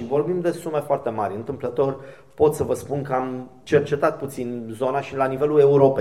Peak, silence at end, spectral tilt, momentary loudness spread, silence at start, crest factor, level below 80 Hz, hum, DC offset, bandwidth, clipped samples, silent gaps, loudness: -4 dBFS; 0 s; -7 dB/octave; 12 LU; 0 s; 18 dB; -54 dBFS; none; 0.2%; 13.5 kHz; under 0.1%; none; -22 LUFS